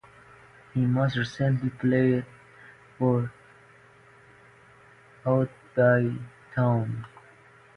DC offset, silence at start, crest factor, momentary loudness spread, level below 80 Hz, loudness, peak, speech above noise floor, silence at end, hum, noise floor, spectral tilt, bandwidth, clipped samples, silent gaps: under 0.1%; 0.75 s; 18 dB; 13 LU; -60 dBFS; -26 LUFS; -10 dBFS; 31 dB; 0.7 s; none; -55 dBFS; -8.5 dB/octave; 6.6 kHz; under 0.1%; none